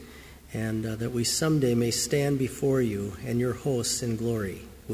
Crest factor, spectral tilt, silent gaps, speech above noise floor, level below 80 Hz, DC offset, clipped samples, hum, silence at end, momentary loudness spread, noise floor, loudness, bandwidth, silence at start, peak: 16 dB; -5 dB/octave; none; 20 dB; -50 dBFS; under 0.1%; under 0.1%; none; 0 s; 11 LU; -47 dBFS; -27 LUFS; 16 kHz; 0 s; -12 dBFS